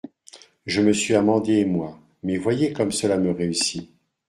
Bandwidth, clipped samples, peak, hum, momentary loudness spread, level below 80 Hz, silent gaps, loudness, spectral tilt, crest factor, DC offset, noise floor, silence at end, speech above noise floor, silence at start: 12.5 kHz; under 0.1%; -4 dBFS; none; 15 LU; -60 dBFS; none; -22 LUFS; -4.5 dB/octave; 18 dB; under 0.1%; -50 dBFS; 0.45 s; 29 dB; 0.05 s